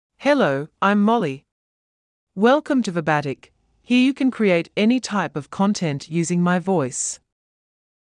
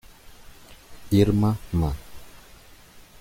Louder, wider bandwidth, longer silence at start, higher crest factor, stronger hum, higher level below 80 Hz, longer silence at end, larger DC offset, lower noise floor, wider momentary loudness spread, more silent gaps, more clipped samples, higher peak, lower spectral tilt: first, -20 LUFS vs -23 LUFS; second, 11 kHz vs 16.5 kHz; about the same, 0.2 s vs 0.25 s; about the same, 16 dB vs 20 dB; neither; second, -66 dBFS vs -40 dBFS; first, 0.9 s vs 0.2 s; neither; first, under -90 dBFS vs -49 dBFS; second, 9 LU vs 16 LU; first, 1.52-2.27 s vs none; neither; about the same, -6 dBFS vs -6 dBFS; second, -5 dB/octave vs -7.5 dB/octave